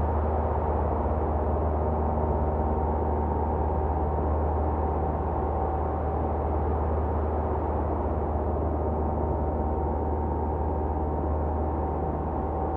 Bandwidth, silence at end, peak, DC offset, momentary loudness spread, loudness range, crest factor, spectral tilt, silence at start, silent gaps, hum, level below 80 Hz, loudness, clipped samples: 2.9 kHz; 0 s; -14 dBFS; under 0.1%; 2 LU; 1 LU; 12 dB; -12 dB/octave; 0 s; none; none; -30 dBFS; -28 LUFS; under 0.1%